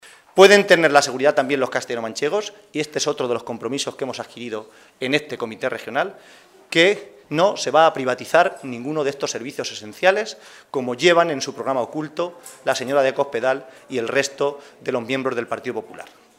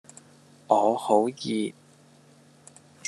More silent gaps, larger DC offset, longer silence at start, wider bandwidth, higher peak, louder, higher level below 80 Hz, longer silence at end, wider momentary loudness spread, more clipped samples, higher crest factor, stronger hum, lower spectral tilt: neither; neither; second, 0.35 s vs 0.7 s; first, 16 kHz vs 12.5 kHz; first, 0 dBFS vs -4 dBFS; first, -20 LUFS vs -25 LUFS; first, -68 dBFS vs -82 dBFS; second, 0.35 s vs 1.35 s; first, 14 LU vs 8 LU; neither; about the same, 20 dB vs 24 dB; neither; second, -3.5 dB/octave vs -5 dB/octave